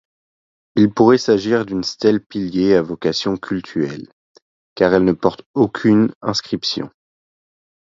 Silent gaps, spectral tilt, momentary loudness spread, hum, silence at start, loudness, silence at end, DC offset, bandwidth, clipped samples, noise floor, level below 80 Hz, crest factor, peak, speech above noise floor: 2.26-2.30 s, 4.13-4.35 s, 4.42-4.76 s, 5.46-5.54 s, 6.15-6.21 s; -6 dB/octave; 10 LU; none; 0.75 s; -17 LUFS; 0.95 s; under 0.1%; 7.6 kHz; under 0.1%; under -90 dBFS; -52 dBFS; 18 dB; 0 dBFS; over 73 dB